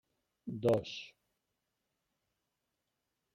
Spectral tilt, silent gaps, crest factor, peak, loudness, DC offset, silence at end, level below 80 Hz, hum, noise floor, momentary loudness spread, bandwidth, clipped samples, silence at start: -6.5 dB/octave; none; 22 dB; -20 dBFS; -35 LUFS; under 0.1%; 2.25 s; -74 dBFS; none; -86 dBFS; 18 LU; 16 kHz; under 0.1%; 0.45 s